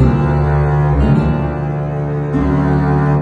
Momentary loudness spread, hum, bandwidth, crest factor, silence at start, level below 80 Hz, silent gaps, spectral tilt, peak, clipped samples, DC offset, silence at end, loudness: 6 LU; none; 4.7 kHz; 12 dB; 0 s; -22 dBFS; none; -10 dB/octave; 0 dBFS; under 0.1%; under 0.1%; 0 s; -15 LUFS